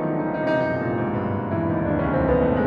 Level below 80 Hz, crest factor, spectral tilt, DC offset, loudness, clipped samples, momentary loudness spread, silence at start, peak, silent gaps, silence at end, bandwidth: -38 dBFS; 12 dB; -10 dB/octave; under 0.1%; -23 LUFS; under 0.1%; 5 LU; 0 s; -10 dBFS; none; 0 s; 5.6 kHz